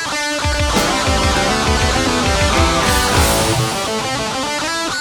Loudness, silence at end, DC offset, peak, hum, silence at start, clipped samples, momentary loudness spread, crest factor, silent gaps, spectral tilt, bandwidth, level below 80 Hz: -15 LUFS; 0 s; under 0.1%; -2 dBFS; none; 0 s; under 0.1%; 5 LU; 14 dB; none; -3.5 dB/octave; 19.5 kHz; -24 dBFS